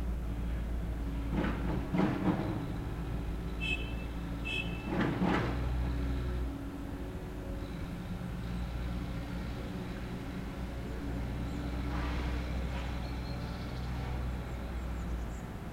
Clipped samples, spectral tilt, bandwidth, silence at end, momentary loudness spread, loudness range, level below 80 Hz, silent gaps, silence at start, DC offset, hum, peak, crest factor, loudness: under 0.1%; -7 dB/octave; 16 kHz; 0 s; 8 LU; 5 LU; -38 dBFS; none; 0 s; under 0.1%; none; -18 dBFS; 18 dB; -37 LUFS